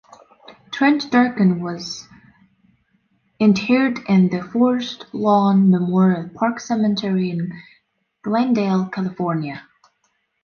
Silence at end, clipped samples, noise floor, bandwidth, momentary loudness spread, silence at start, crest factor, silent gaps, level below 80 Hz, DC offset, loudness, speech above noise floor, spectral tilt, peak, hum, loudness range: 0.85 s; under 0.1%; -68 dBFS; 7 kHz; 14 LU; 0.5 s; 16 dB; none; -62 dBFS; under 0.1%; -19 LUFS; 50 dB; -7 dB/octave; -4 dBFS; none; 5 LU